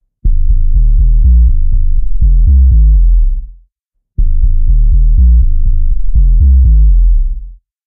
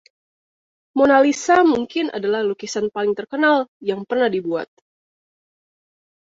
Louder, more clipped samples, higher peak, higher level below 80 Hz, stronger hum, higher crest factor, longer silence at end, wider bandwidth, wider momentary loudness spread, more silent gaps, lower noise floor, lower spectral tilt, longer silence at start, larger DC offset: first, -12 LUFS vs -19 LUFS; neither; about the same, 0 dBFS vs -2 dBFS; first, -8 dBFS vs -62 dBFS; neither; second, 6 dB vs 18 dB; second, 0.35 s vs 1.55 s; second, 0.4 kHz vs 7.8 kHz; about the same, 10 LU vs 11 LU; second, none vs 3.68-3.80 s; second, -67 dBFS vs under -90 dBFS; first, -16.5 dB/octave vs -4 dB/octave; second, 0.25 s vs 0.95 s; first, 0.6% vs under 0.1%